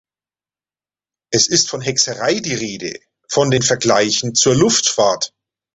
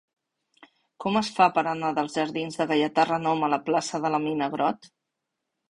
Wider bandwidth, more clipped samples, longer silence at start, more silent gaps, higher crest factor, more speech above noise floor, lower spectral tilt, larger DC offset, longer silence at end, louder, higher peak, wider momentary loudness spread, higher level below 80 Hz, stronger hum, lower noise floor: second, 8.4 kHz vs 11.5 kHz; neither; first, 1.3 s vs 1 s; neither; about the same, 18 dB vs 22 dB; first, over 74 dB vs 58 dB; second, -3 dB/octave vs -5 dB/octave; neither; second, 0.5 s vs 0.85 s; first, -15 LUFS vs -25 LUFS; first, 0 dBFS vs -6 dBFS; first, 11 LU vs 7 LU; first, -52 dBFS vs -68 dBFS; neither; first, under -90 dBFS vs -83 dBFS